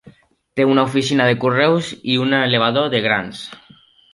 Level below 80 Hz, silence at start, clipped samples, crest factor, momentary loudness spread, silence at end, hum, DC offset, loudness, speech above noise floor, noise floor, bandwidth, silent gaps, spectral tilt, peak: -58 dBFS; 0.05 s; under 0.1%; 16 dB; 12 LU; 0.55 s; none; under 0.1%; -17 LUFS; 33 dB; -50 dBFS; 11.5 kHz; none; -5.5 dB/octave; -2 dBFS